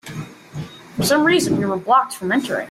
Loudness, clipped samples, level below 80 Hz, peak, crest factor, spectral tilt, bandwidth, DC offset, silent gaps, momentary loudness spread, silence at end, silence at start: -18 LUFS; under 0.1%; -54 dBFS; -4 dBFS; 16 dB; -4.5 dB/octave; 16 kHz; under 0.1%; none; 18 LU; 0 s; 0.05 s